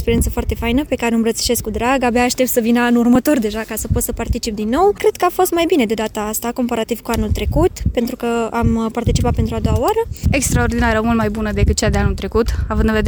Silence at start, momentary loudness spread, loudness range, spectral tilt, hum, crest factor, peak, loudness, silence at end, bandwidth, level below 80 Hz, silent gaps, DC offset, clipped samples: 0 s; 6 LU; 3 LU; -5 dB/octave; none; 12 dB; -4 dBFS; -17 LUFS; 0 s; over 20 kHz; -26 dBFS; none; under 0.1%; under 0.1%